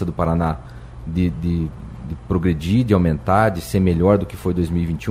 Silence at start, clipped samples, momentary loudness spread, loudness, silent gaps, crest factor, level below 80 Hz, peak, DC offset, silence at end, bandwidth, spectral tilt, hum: 0 s; under 0.1%; 15 LU; -19 LUFS; none; 16 dB; -34 dBFS; -2 dBFS; under 0.1%; 0 s; 16 kHz; -8 dB/octave; none